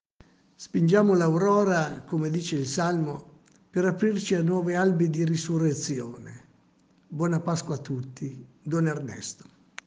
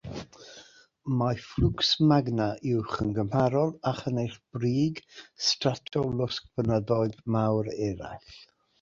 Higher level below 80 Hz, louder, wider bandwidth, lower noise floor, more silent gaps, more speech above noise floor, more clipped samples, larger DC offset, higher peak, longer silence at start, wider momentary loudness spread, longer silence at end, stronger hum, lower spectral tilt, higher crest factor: second, -68 dBFS vs -48 dBFS; about the same, -26 LUFS vs -28 LUFS; first, 9.6 kHz vs 7.6 kHz; first, -62 dBFS vs -54 dBFS; neither; first, 37 dB vs 27 dB; neither; neither; about the same, -8 dBFS vs -8 dBFS; first, 0.6 s vs 0.05 s; about the same, 17 LU vs 18 LU; first, 0.55 s vs 0.35 s; neither; about the same, -6.5 dB/octave vs -6 dB/octave; about the same, 18 dB vs 20 dB